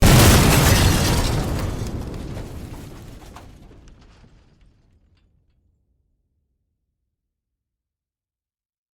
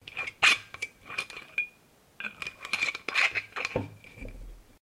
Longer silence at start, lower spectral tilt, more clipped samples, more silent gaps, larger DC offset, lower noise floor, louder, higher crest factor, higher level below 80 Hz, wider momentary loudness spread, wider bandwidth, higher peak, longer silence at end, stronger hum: about the same, 0 s vs 0.05 s; first, -4.5 dB/octave vs -1.5 dB/octave; neither; neither; neither; first, under -90 dBFS vs -61 dBFS; first, -17 LUFS vs -29 LUFS; second, 18 dB vs 24 dB; first, -28 dBFS vs -54 dBFS; first, 26 LU vs 21 LU; first, over 20 kHz vs 16 kHz; first, -4 dBFS vs -8 dBFS; first, 5.6 s vs 0.2 s; neither